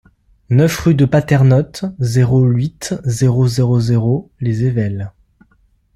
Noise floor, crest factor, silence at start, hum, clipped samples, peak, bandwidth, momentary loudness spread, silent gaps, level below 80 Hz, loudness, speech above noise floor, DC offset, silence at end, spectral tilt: -56 dBFS; 14 dB; 0.5 s; none; under 0.1%; -2 dBFS; 13 kHz; 9 LU; none; -42 dBFS; -15 LUFS; 42 dB; under 0.1%; 0.85 s; -7 dB/octave